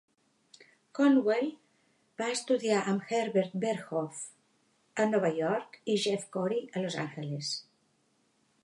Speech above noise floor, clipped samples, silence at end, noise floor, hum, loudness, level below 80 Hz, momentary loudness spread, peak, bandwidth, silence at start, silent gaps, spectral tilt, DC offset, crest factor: 42 dB; under 0.1%; 1.05 s; -72 dBFS; none; -31 LUFS; -84 dBFS; 12 LU; -14 dBFS; 11.5 kHz; 0.6 s; none; -5 dB/octave; under 0.1%; 18 dB